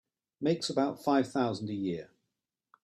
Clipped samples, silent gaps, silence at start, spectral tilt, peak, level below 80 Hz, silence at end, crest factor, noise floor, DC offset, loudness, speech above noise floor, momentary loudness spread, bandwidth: under 0.1%; none; 0.4 s; -5.5 dB/octave; -14 dBFS; -74 dBFS; 0.8 s; 18 dB; -86 dBFS; under 0.1%; -32 LUFS; 56 dB; 7 LU; 13 kHz